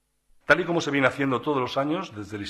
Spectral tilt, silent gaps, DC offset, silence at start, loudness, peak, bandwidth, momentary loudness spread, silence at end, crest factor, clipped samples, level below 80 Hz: -5.5 dB/octave; none; under 0.1%; 0.5 s; -24 LUFS; -4 dBFS; 13.5 kHz; 10 LU; 0 s; 20 dB; under 0.1%; -60 dBFS